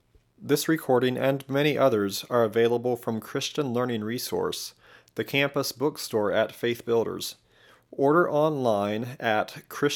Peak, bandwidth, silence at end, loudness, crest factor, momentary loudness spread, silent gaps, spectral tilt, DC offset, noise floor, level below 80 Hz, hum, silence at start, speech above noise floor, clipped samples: -8 dBFS; 18 kHz; 0 s; -26 LUFS; 18 dB; 9 LU; none; -5 dB/octave; under 0.1%; -57 dBFS; -72 dBFS; none; 0.4 s; 31 dB; under 0.1%